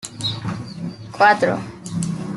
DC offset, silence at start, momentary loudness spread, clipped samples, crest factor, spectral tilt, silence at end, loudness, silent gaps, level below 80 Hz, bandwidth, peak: under 0.1%; 0 s; 16 LU; under 0.1%; 20 dB; -4.5 dB/octave; 0 s; -20 LUFS; none; -54 dBFS; 12 kHz; -2 dBFS